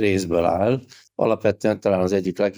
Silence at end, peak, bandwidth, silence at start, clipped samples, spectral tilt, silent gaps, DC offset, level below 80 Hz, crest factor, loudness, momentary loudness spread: 0.05 s; -6 dBFS; over 20 kHz; 0 s; under 0.1%; -6.5 dB/octave; none; under 0.1%; -52 dBFS; 16 dB; -21 LUFS; 4 LU